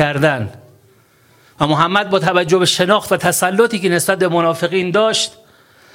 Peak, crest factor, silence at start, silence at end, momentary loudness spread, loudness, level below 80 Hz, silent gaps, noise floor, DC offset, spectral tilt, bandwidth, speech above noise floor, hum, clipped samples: 0 dBFS; 16 dB; 0 s; 0.65 s; 5 LU; -15 LUFS; -52 dBFS; none; -51 dBFS; under 0.1%; -4 dB/octave; 17 kHz; 36 dB; none; under 0.1%